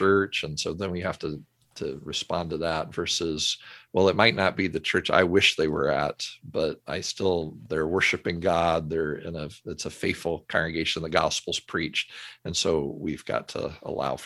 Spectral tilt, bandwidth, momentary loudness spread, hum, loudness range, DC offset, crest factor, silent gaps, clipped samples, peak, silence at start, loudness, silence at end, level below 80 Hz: -4 dB/octave; 12.5 kHz; 13 LU; none; 5 LU; under 0.1%; 24 dB; none; under 0.1%; -2 dBFS; 0 s; -26 LUFS; 0 s; -50 dBFS